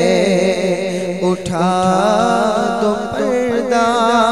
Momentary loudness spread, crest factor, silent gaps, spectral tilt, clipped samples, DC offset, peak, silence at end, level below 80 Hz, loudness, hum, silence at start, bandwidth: 5 LU; 14 dB; none; -5 dB/octave; under 0.1%; 0.6%; 0 dBFS; 0 s; -46 dBFS; -15 LUFS; none; 0 s; 14 kHz